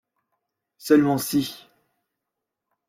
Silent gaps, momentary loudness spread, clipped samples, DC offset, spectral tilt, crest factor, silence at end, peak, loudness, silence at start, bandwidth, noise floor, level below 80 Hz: none; 15 LU; under 0.1%; under 0.1%; -5 dB/octave; 20 dB; 1.35 s; -6 dBFS; -21 LUFS; 0.85 s; 16.5 kHz; -84 dBFS; -64 dBFS